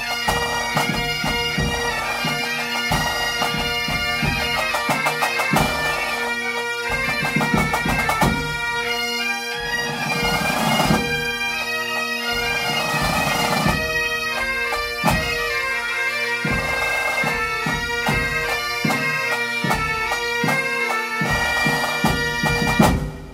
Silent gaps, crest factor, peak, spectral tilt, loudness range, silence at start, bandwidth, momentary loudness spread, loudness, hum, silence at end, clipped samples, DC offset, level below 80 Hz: none; 20 dB; -2 dBFS; -3.5 dB/octave; 1 LU; 0 s; 16 kHz; 3 LU; -20 LUFS; none; 0 s; under 0.1%; under 0.1%; -36 dBFS